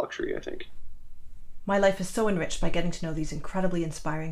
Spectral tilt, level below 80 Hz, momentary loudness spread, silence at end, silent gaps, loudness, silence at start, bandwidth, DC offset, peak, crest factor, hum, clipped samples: -5.5 dB/octave; -38 dBFS; 15 LU; 0 s; none; -29 LUFS; 0 s; 12.5 kHz; under 0.1%; -10 dBFS; 18 dB; none; under 0.1%